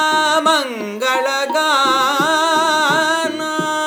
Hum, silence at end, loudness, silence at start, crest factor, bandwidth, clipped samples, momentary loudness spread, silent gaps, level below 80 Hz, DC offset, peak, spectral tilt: none; 0 s; -15 LUFS; 0 s; 14 dB; over 20 kHz; under 0.1%; 6 LU; none; -84 dBFS; under 0.1%; -2 dBFS; -2 dB/octave